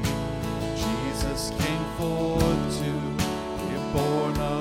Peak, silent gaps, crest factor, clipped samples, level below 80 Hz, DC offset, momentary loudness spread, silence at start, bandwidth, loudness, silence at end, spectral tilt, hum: -8 dBFS; none; 18 dB; under 0.1%; -38 dBFS; under 0.1%; 6 LU; 0 s; 17 kHz; -27 LUFS; 0 s; -5.5 dB/octave; none